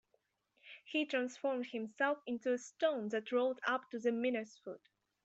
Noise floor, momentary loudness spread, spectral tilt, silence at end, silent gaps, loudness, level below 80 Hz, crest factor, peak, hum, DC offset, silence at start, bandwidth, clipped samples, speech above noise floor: -80 dBFS; 15 LU; -4 dB/octave; 0.5 s; none; -37 LUFS; -88 dBFS; 20 dB; -20 dBFS; none; under 0.1%; 0.65 s; 8.2 kHz; under 0.1%; 43 dB